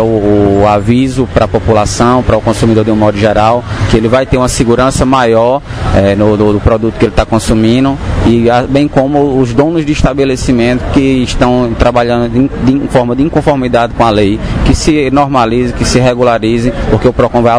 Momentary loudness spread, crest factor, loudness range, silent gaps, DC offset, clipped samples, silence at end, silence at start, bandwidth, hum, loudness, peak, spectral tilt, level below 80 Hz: 3 LU; 8 dB; 1 LU; none; 0.4%; 1%; 0 s; 0 s; 11 kHz; none; -9 LUFS; 0 dBFS; -6.5 dB/octave; -22 dBFS